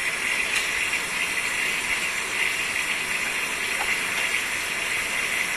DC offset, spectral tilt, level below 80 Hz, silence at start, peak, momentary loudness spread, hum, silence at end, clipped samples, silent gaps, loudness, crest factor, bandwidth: under 0.1%; 0 dB/octave; -54 dBFS; 0 s; -10 dBFS; 2 LU; none; 0 s; under 0.1%; none; -23 LUFS; 16 dB; 14 kHz